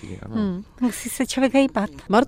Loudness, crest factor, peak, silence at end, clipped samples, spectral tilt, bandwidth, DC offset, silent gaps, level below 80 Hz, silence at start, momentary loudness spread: -23 LUFS; 18 dB; -4 dBFS; 0 s; under 0.1%; -5 dB/octave; 16 kHz; under 0.1%; none; -48 dBFS; 0 s; 8 LU